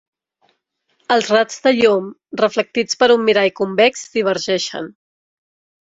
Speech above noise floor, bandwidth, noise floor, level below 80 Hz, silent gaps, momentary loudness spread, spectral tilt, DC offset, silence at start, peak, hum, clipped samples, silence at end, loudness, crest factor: 51 dB; 8 kHz; -67 dBFS; -62 dBFS; none; 8 LU; -3.5 dB/octave; under 0.1%; 1.1 s; -2 dBFS; none; under 0.1%; 0.95 s; -16 LUFS; 16 dB